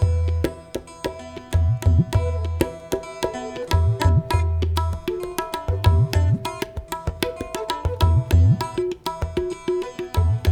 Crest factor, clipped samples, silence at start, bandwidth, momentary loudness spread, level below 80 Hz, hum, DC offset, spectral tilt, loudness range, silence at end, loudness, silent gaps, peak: 20 dB; under 0.1%; 0 s; 17 kHz; 11 LU; -30 dBFS; none; under 0.1%; -6.5 dB/octave; 2 LU; 0 s; -23 LUFS; none; 0 dBFS